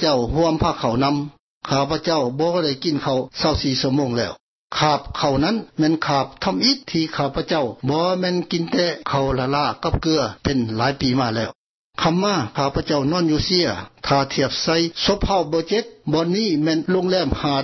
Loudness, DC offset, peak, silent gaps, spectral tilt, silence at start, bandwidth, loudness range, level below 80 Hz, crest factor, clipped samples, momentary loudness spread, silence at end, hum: -20 LUFS; under 0.1%; -4 dBFS; 1.39-1.61 s, 4.40-4.68 s, 11.55-11.91 s; -5.5 dB/octave; 0 s; 6.2 kHz; 1 LU; -40 dBFS; 16 dB; under 0.1%; 5 LU; 0 s; none